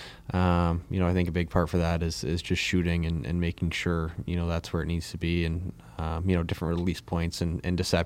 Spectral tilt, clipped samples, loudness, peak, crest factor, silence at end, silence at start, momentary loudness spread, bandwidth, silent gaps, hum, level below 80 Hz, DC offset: -6 dB/octave; under 0.1%; -29 LUFS; -8 dBFS; 18 dB; 0 s; 0 s; 5 LU; 14.5 kHz; none; none; -40 dBFS; under 0.1%